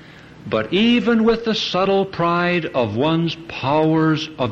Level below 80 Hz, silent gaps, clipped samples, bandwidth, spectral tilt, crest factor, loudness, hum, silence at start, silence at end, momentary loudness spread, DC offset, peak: -48 dBFS; none; under 0.1%; 7.4 kHz; -6.5 dB/octave; 12 dB; -18 LUFS; none; 0 s; 0 s; 8 LU; under 0.1%; -6 dBFS